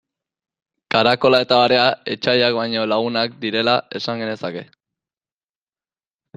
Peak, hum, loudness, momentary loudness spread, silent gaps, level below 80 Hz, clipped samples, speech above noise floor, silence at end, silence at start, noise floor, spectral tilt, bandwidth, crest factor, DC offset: 0 dBFS; none; -18 LUFS; 11 LU; none; -62 dBFS; under 0.1%; over 72 dB; 1.75 s; 0.95 s; under -90 dBFS; -5.5 dB/octave; 9.6 kHz; 20 dB; under 0.1%